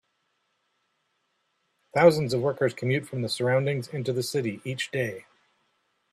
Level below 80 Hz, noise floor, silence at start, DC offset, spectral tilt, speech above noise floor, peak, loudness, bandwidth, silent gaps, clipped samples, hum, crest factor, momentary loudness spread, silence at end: -68 dBFS; -75 dBFS; 1.95 s; under 0.1%; -5.5 dB/octave; 49 dB; -4 dBFS; -26 LUFS; 14 kHz; none; under 0.1%; none; 24 dB; 11 LU; 0.9 s